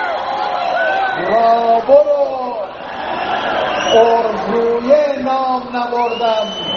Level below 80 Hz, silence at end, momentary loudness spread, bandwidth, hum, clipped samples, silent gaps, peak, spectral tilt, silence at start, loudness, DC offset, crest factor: -52 dBFS; 0 s; 10 LU; 6.8 kHz; none; under 0.1%; none; 0 dBFS; -1.5 dB/octave; 0 s; -15 LUFS; under 0.1%; 14 dB